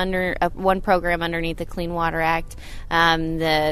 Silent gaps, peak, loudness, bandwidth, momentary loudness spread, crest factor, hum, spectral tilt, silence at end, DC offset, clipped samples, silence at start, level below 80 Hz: none; -4 dBFS; -22 LUFS; 13.5 kHz; 9 LU; 18 dB; none; -5.5 dB/octave; 0 s; under 0.1%; under 0.1%; 0 s; -34 dBFS